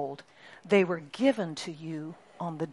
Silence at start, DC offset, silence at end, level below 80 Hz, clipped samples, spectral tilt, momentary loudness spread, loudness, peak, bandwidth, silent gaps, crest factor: 0 s; under 0.1%; 0 s; -78 dBFS; under 0.1%; -6 dB/octave; 18 LU; -30 LUFS; -10 dBFS; 11.5 kHz; none; 20 dB